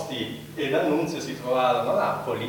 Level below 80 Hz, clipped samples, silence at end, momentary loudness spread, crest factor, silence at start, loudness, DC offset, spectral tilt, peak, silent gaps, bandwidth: -62 dBFS; under 0.1%; 0 s; 9 LU; 16 dB; 0 s; -25 LUFS; under 0.1%; -5 dB/octave; -10 dBFS; none; 19.5 kHz